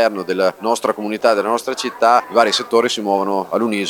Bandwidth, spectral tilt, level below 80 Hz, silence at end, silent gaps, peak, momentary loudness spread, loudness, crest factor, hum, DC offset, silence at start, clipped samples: 19 kHz; -3.5 dB/octave; -68 dBFS; 0 s; none; 0 dBFS; 6 LU; -17 LUFS; 16 dB; none; under 0.1%; 0 s; under 0.1%